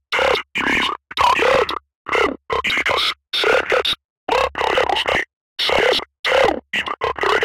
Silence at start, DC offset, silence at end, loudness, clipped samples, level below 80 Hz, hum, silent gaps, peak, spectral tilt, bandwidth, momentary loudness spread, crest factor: 0.1 s; under 0.1%; 0 s; -18 LUFS; under 0.1%; -44 dBFS; none; 1.95-2.05 s, 4.05-4.27 s, 5.33-5.56 s, 6.19-6.24 s; -2 dBFS; -2.5 dB/octave; 16.5 kHz; 6 LU; 16 dB